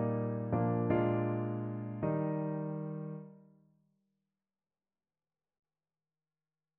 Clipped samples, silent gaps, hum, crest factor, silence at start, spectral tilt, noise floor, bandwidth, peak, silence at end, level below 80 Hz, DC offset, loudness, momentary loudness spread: under 0.1%; none; none; 18 dB; 0 s; -9.5 dB/octave; under -90 dBFS; 3.2 kHz; -18 dBFS; 3.4 s; -68 dBFS; under 0.1%; -35 LUFS; 12 LU